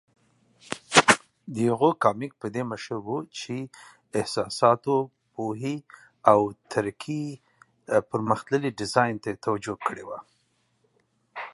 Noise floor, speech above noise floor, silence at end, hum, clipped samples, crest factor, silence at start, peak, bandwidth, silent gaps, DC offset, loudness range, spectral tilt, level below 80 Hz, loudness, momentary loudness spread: -70 dBFS; 44 dB; 0.05 s; none; under 0.1%; 26 dB; 0.7 s; 0 dBFS; 11.5 kHz; none; under 0.1%; 4 LU; -4 dB/octave; -64 dBFS; -26 LUFS; 17 LU